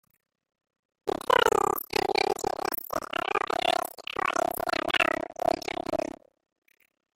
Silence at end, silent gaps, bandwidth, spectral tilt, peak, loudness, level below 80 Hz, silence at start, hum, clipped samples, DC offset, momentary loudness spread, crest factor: 1.2 s; none; 17 kHz; -2.5 dB/octave; -8 dBFS; -28 LUFS; -58 dBFS; 1.05 s; none; under 0.1%; under 0.1%; 9 LU; 22 dB